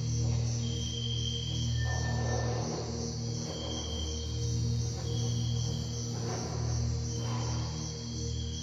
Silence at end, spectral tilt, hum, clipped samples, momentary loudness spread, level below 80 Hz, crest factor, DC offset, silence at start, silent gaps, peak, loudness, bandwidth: 0 s; -4.5 dB/octave; none; under 0.1%; 4 LU; -44 dBFS; 14 dB; under 0.1%; 0 s; none; -20 dBFS; -34 LUFS; 7.8 kHz